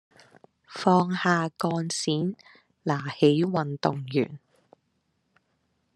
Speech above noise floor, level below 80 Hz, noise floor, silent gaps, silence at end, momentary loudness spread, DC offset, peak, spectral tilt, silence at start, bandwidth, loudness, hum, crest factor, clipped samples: 49 dB; -72 dBFS; -74 dBFS; none; 1.6 s; 11 LU; under 0.1%; -6 dBFS; -5.5 dB/octave; 0.7 s; 12 kHz; -26 LUFS; none; 22 dB; under 0.1%